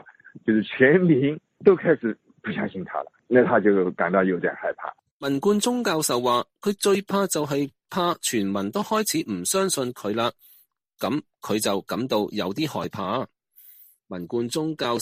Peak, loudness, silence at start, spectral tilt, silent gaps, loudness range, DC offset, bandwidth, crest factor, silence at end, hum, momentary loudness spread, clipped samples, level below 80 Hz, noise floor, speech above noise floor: -2 dBFS; -24 LUFS; 0.05 s; -4.5 dB/octave; 5.11-5.20 s; 6 LU; under 0.1%; 15.5 kHz; 22 dB; 0 s; none; 11 LU; under 0.1%; -66 dBFS; -59 dBFS; 36 dB